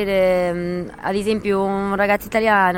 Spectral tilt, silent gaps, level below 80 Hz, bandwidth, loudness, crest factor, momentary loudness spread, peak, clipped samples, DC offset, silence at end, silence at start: -6 dB/octave; none; -44 dBFS; 17 kHz; -19 LUFS; 16 dB; 7 LU; -4 dBFS; under 0.1%; under 0.1%; 0 s; 0 s